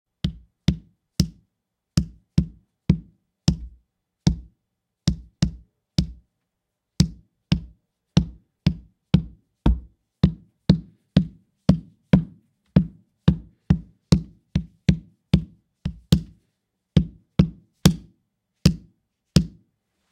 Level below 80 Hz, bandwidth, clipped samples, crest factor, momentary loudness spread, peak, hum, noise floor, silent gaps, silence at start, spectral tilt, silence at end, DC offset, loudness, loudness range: -36 dBFS; 16 kHz; under 0.1%; 24 dB; 12 LU; 0 dBFS; none; -81 dBFS; none; 0.25 s; -6.5 dB/octave; 0.65 s; under 0.1%; -25 LUFS; 5 LU